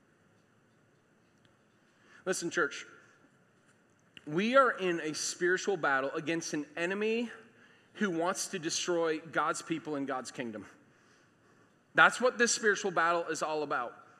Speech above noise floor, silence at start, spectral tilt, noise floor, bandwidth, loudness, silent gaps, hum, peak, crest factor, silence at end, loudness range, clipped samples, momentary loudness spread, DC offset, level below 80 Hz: 36 dB; 2.25 s; -3 dB/octave; -67 dBFS; 14.5 kHz; -31 LUFS; none; none; -8 dBFS; 26 dB; 0.2 s; 10 LU; under 0.1%; 13 LU; under 0.1%; -88 dBFS